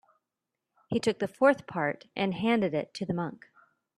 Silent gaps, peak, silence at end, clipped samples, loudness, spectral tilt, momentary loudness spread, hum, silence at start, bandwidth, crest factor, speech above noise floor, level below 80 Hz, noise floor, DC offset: none; -10 dBFS; 0.65 s; under 0.1%; -29 LUFS; -6 dB/octave; 9 LU; none; 0.9 s; 12 kHz; 22 dB; 58 dB; -70 dBFS; -87 dBFS; under 0.1%